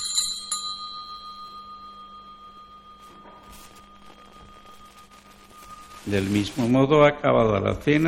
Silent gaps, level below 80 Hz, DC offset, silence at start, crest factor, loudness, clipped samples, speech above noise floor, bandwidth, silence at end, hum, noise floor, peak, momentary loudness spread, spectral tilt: none; -52 dBFS; under 0.1%; 0 s; 24 dB; -22 LUFS; under 0.1%; 30 dB; 16.5 kHz; 0 s; 50 Hz at -55 dBFS; -50 dBFS; -2 dBFS; 27 LU; -4.5 dB/octave